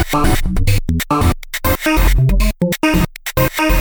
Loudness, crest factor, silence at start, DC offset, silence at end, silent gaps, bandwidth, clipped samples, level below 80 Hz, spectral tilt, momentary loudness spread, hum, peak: -16 LUFS; 12 dB; 0 s; under 0.1%; 0 s; none; over 20 kHz; under 0.1%; -18 dBFS; -5.5 dB/octave; 3 LU; none; -2 dBFS